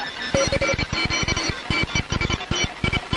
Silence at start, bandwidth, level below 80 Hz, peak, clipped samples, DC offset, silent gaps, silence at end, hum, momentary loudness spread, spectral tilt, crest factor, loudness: 0 s; 11.5 kHz; -34 dBFS; -4 dBFS; under 0.1%; under 0.1%; none; 0 s; none; 3 LU; -3.5 dB/octave; 20 dB; -22 LUFS